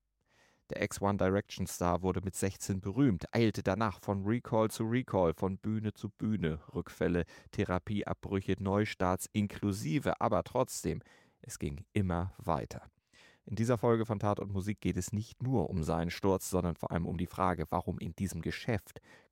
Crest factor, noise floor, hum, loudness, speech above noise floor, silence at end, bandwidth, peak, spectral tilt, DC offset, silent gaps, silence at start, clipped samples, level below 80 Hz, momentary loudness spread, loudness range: 18 dB; -71 dBFS; none; -34 LUFS; 37 dB; 0.3 s; 16.5 kHz; -14 dBFS; -6.5 dB/octave; under 0.1%; none; 0.7 s; under 0.1%; -54 dBFS; 8 LU; 3 LU